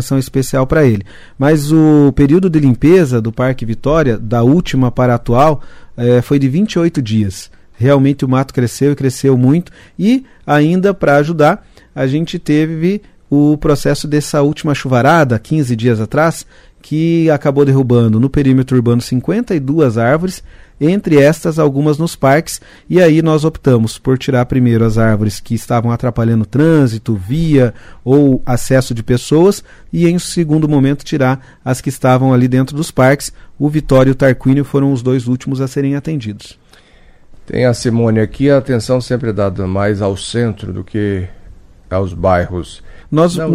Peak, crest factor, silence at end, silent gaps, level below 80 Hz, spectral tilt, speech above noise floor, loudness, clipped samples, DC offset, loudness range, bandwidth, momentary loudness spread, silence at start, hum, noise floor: 0 dBFS; 12 dB; 0 s; none; -34 dBFS; -7 dB/octave; 31 dB; -13 LUFS; under 0.1%; under 0.1%; 4 LU; 15.5 kHz; 9 LU; 0 s; none; -43 dBFS